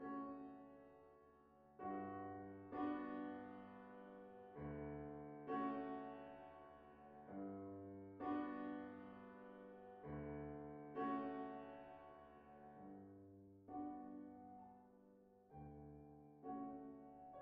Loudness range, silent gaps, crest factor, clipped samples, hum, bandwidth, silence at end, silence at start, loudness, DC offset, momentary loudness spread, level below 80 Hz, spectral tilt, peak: 7 LU; none; 18 dB; under 0.1%; none; 4.9 kHz; 0 s; 0 s; -52 LUFS; under 0.1%; 17 LU; -74 dBFS; -6.5 dB/octave; -34 dBFS